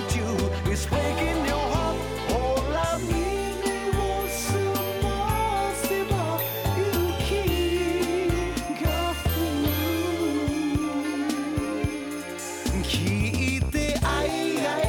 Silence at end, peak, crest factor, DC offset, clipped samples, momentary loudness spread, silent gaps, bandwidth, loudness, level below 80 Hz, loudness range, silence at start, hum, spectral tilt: 0 s; -14 dBFS; 10 dB; under 0.1%; under 0.1%; 3 LU; none; 19 kHz; -26 LUFS; -36 dBFS; 2 LU; 0 s; none; -5 dB/octave